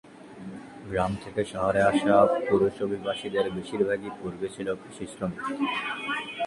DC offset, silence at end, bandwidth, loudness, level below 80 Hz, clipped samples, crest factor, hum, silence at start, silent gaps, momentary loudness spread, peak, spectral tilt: under 0.1%; 0 s; 11.5 kHz; -27 LUFS; -56 dBFS; under 0.1%; 20 dB; none; 0.05 s; none; 16 LU; -6 dBFS; -6 dB/octave